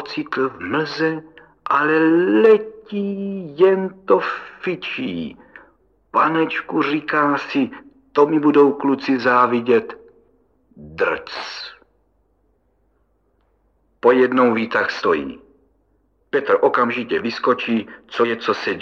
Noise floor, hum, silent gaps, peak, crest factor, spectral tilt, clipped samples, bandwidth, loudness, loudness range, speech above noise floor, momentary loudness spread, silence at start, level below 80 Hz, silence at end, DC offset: -63 dBFS; none; none; 0 dBFS; 18 dB; -6.5 dB/octave; under 0.1%; 7 kHz; -19 LUFS; 8 LU; 45 dB; 13 LU; 0 s; -62 dBFS; 0 s; under 0.1%